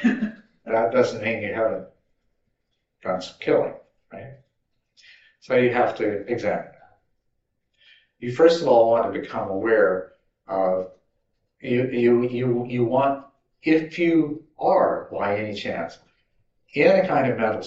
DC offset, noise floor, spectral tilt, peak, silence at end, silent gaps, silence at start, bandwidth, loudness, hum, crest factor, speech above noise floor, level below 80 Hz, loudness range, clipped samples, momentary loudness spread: under 0.1%; -75 dBFS; -5 dB/octave; -2 dBFS; 0 s; none; 0 s; 8 kHz; -22 LUFS; none; 20 dB; 54 dB; -68 dBFS; 6 LU; under 0.1%; 14 LU